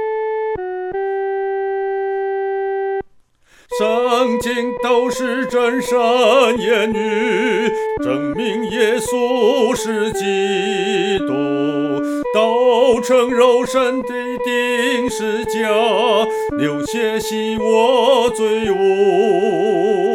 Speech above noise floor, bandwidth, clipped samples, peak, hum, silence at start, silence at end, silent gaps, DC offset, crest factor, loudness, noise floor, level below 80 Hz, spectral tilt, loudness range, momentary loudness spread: 36 dB; 16.5 kHz; under 0.1%; -2 dBFS; none; 0 s; 0 s; none; under 0.1%; 16 dB; -17 LUFS; -51 dBFS; -50 dBFS; -4 dB/octave; 4 LU; 7 LU